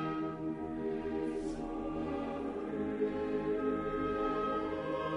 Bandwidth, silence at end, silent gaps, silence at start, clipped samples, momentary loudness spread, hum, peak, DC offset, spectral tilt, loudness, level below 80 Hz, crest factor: 10.5 kHz; 0 s; none; 0 s; under 0.1%; 5 LU; none; -22 dBFS; under 0.1%; -7.5 dB/octave; -36 LUFS; -54 dBFS; 14 dB